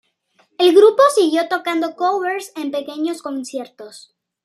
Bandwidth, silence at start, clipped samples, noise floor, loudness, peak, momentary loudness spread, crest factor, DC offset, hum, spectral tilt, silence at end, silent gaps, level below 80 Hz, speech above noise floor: 14 kHz; 0.6 s; under 0.1%; -61 dBFS; -17 LUFS; -2 dBFS; 19 LU; 16 dB; under 0.1%; none; -2 dB/octave; 0.45 s; none; -76 dBFS; 44 dB